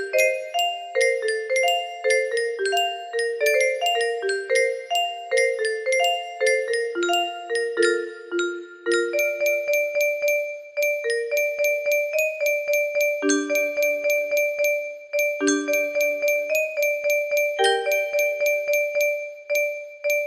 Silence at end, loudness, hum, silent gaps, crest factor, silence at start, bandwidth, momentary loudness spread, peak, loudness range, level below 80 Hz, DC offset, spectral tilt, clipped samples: 0 s; -22 LUFS; none; none; 16 dB; 0 s; 15.5 kHz; 5 LU; -6 dBFS; 2 LU; -74 dBFS; under 0.1%; 0 dB/octave; under 0.1%